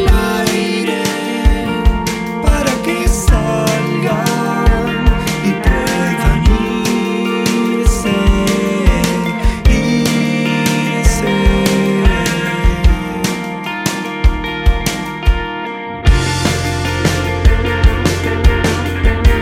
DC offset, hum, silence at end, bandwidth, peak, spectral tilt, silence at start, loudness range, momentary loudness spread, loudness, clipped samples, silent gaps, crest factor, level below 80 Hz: under 0.1%; none; 0 s; 16 kHz; 0 dBFS; -5 dB/octave; 0 s; 3 LU; 4 LU; -15 LUFS; under 0.1%; none; 14 dB; -16 dBFS